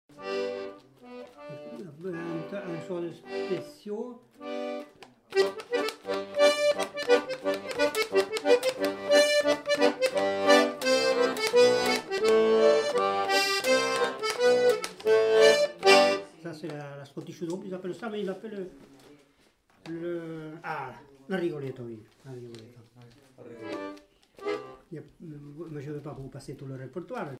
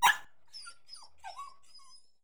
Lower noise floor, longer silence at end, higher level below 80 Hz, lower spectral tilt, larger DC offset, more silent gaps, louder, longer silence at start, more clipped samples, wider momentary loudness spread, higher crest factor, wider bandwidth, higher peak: first, -65 dBFS vs -59 dBFS; second, 0 s vs 0.75 s; first, -70 dBFS vs -78 dBFS; first, -3.5 dB/octave vs 2 dB/octave; second, under 0.1% vs 0.3%; neither; first, -26 LUFS vs -37 LUFS; first, 0.15 s vs 0 s; neither; about the same, 21 LU vs 21 LU; about the same, 22 dB vs 26 dB; second, 16 kHz vs over 20 kHz; first, -6 dBFS vs -10 dBFS